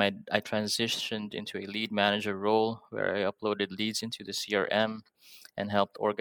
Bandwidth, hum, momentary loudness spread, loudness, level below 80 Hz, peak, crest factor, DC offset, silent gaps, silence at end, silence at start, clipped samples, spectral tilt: 19 kHz; none; 8 LU; -30 LUFS; -76 dBFS; -8 dBFS; 24 dB; under 0.1%; none; 0 s; 0 s; under 0.1%; -3.5 dB/octave